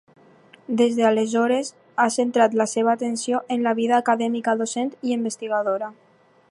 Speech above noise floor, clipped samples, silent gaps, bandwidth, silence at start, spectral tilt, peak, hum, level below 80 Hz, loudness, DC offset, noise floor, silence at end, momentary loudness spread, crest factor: 31 dB; under 0.1%; none; 11.5 kHz; 0.7 s; -4 dB/octave; -4 dBFS; none; -78 dBFS; -22 LUFS; under 0.1%; -52 dBFS; 0.6 s; 7 LU; 18 dB